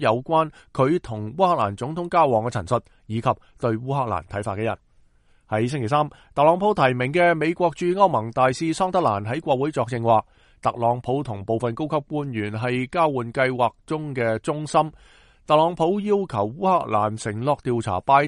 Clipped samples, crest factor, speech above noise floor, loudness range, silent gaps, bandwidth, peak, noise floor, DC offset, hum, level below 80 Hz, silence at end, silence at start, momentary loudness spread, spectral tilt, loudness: under 0.1%; 20 dB; 35 dB; 4 LU; none; 11.5 kHz; -2 dBFS; -57 dBFS; under 0.1%; none; -54 dBFS; 0 s; 0 s; 8 LU; -6.5 dB/octave; -23 LUFS